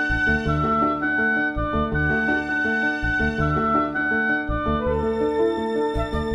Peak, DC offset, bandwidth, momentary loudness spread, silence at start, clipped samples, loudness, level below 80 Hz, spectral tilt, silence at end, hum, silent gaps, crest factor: -8 dBFS; under 0.1%; 9.6 kHz; 3 LU; 0 s; under 0.1%; -22 LUFS; -34 dBFS; -7 dB/octave; 0 s; none; none; 14 dB